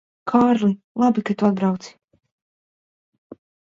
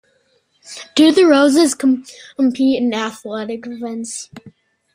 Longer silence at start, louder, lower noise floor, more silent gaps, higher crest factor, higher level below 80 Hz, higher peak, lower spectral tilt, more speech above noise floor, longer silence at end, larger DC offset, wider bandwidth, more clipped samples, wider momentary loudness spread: second, 0.25 s vs 0.7 s; second, -20 LUFS vs -16 LUFS; first, under -90 dBFS vs -61 dBFS; first, 0.84-0.95 s vs none; about the same, 20 dB vs 16 dB; about the same, -62 dBFS vs -62 dBFS; about the same, -2 dBFS vs -2 dBFS; first, -7.5 dB/octave vs -3 dB/octave; first, over 71 dB vs 45 dB; first, 1.8 s vs 0.45 s; neither; second, 7.6 kHz vs 15.5 kHz; neither; second, 6 LU vs 19 LU